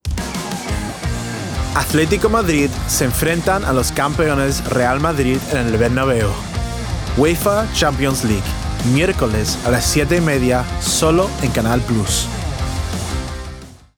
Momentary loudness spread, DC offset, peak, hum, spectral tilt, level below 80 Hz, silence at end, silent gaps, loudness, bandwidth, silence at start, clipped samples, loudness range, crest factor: 9 LU; under 0.1%; -4 dBFS; none; -4.5 dB/octave; -28 dBFS; 0.25 s; none; -17 LUFS; over 20 kHz; 0.05 s; under 0.1%; 2 LU; 14 dB